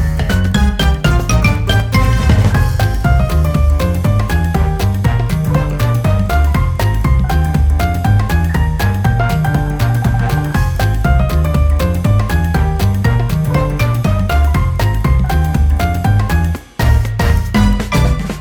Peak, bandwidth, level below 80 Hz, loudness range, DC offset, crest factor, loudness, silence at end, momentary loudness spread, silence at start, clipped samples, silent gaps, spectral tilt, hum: 0 dBFS; over 20 kHz; -16 dBFS; 1 LU; under 0.1%; 12 dB; -14 LUFS; 0 s; 2 LU; 0 s; under 0.1%; none; -6.5 dB/octave; none